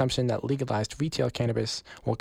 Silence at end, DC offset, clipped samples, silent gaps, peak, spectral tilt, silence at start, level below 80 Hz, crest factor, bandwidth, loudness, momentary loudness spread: 0.05 s; under 0.1%; under 0.1%; none; -14 dBFS; -5.5 dB/octave; 0 s; -52 dBFS; 14 dB; 15 kHz; -29 LUFS; 5 LU